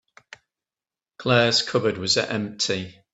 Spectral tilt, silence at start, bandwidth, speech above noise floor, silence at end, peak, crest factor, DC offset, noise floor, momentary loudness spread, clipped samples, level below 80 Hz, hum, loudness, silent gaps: -3.5 dB/octave; 1.2 s; 8.4 kHz; over 67 dB; 0.2 s; -4 dBFS; 22 dB; under 0.1%; under -90 dBFS; 10 LU; under 0.1%; -64 dBFS; none; -22 LUFS; none